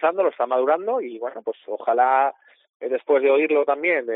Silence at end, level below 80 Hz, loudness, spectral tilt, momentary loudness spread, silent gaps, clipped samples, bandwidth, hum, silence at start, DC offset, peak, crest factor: 0 s; -84 dBFS; -21 LUFS; -1.5 dB/octave; 12 LU; 2.69-2.80 s; under 0.1%; 4 kHz; none; 0 s; under 0.1%; -6 dBFS; 16 dB